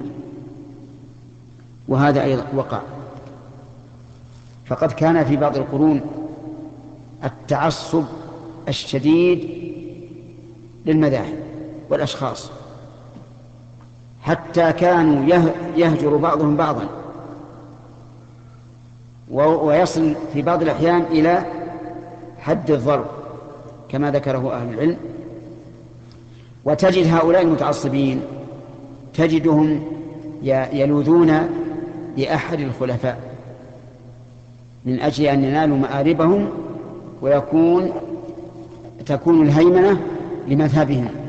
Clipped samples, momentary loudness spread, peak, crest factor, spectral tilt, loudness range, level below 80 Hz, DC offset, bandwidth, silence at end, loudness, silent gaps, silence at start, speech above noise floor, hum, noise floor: under 0.1%; 21 LU; -4 dBFS; 16 dB; -7.5 dB/octave; 6 LU; -50 dBFS; under 0.1%; 8.2 kHz; 0 s; -18 LUFS; none; 0 s; 26 dB; none; -43 dBFS